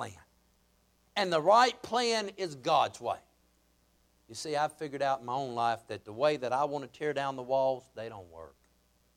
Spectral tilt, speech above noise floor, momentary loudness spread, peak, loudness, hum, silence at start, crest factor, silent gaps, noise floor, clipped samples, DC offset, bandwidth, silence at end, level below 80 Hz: -3.5 dB/octave; 38 dB; 18 LU; -12 dBFS; -31 LUFS; none; 0 s; 20 dB; none; -69 dBFS; under 0.1%; under 0.1%; 15.5 kHz; 0.7 s; -72 dBFS